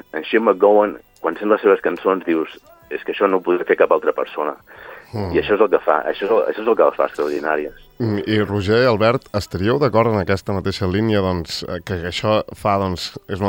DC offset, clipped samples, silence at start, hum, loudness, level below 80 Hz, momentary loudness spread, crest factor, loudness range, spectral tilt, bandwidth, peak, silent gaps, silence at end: under 0.1%; under 0.1%; 0.15 s; none; -18 LUFS; -50 dBFS; 11 LU; 18 dB; 2 LU; -6.5 dB/octave; 16.5 kHz; 0 dBFS; none; 0 s